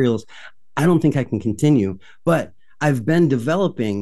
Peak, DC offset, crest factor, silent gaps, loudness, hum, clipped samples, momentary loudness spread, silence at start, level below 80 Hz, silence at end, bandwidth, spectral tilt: -4 dBFS; 0.9%; 14 dB; none; -19 LUFS; none; under 0.1%; 9 LU; 0 s; -54 dBFS; 0 s; 12.5 kHz; -7.5 dB/octave